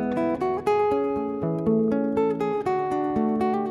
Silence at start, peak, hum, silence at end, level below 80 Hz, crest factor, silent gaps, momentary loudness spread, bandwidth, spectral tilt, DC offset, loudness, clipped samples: 0 s; -10 dBFS; none; 0 s; -54 dBFS; 12 dB; none; 3 LU; 11.5 kHz; -8.5 dB/octave; under 0.1%; -24 LUFS; under 0.1%